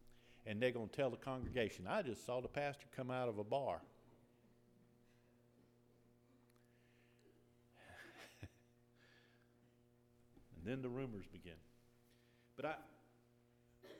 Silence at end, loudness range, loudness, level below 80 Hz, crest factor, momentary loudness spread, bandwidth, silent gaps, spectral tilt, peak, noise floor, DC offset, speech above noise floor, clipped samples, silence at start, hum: 0 s; 20 LU; -45 LUFS; -70 dBFS; 24 dB; 19 LU; 17 kHz; none; -6 dB/octave; -24 dBFS; -73 dBFS; under 0.1%; 29 dB; under 0.1%; 0.05 s; none